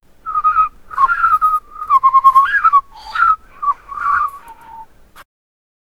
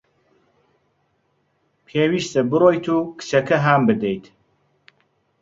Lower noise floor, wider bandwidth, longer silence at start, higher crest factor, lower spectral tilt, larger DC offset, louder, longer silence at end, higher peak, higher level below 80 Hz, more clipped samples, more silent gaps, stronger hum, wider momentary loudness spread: second, -38 dBFS vs -67 dBFS; first, 14.5 kHz vs 7.8 kHz; second, 0.25 s vs 1.95 s; about the same, 16 dB vs 20 dB; second, -1.5 dB/octave vs -6 dB/octave; neither; first, -14 LUFS vs -19 LUFS; second, 0.75 s vs 1.2 s; about the same, 0 dBFS vs -2 dBFS; first, -46 dBFS vs -60 dBFS; neither; neither; neither; first, 11 LU vs 8 LU